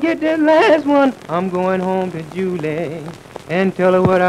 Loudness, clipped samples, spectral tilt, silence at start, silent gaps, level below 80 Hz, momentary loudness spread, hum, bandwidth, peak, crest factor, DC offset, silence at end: -16 LUFS; under 0.1%; -7 dB/octave; 0 s; none; -52 dBFS; 12 LU; none; 13 kHz; 0 dBFS; 16 dB; under 0.1%; 0 s